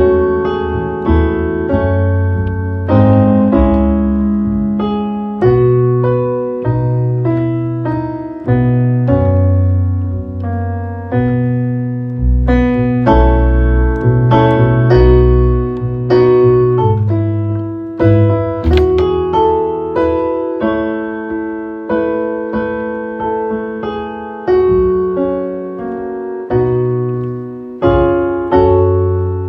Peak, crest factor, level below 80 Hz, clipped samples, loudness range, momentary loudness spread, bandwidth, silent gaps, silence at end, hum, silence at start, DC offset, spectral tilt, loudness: 0 dBFS; 12 dB; -22 dBFS; under 0.1%; 6 LU; 10 LU; 5.8 kHz; none; 0 s; none; 0 s; under 0.1%; -10.5 dB/octave; -14 LUFS